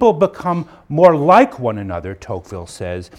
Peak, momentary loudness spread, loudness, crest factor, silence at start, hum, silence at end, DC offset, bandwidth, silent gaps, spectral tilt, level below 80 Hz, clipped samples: 0 dBFS; 17 LU; -15 LUFS; 16 dB; 0 s; none; 0.15 s; under 0.1%; 11.5 kHz; none; -7 dB/octave; -46 dBFS; 0.2%